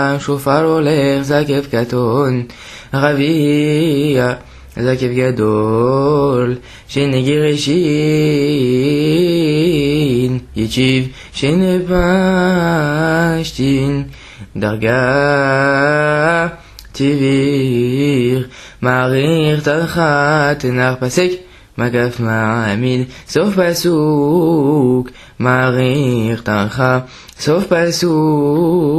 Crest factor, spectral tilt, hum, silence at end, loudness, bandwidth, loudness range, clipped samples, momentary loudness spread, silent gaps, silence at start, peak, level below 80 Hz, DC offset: 14 dB; -6.5 dB/octave; none; 0 s; -14 LUFS; 14 kHz; 2 LU; under 0.1%; 7 LU; none; 0 s; 0 dBFS; -40 dBFS; under 0.1%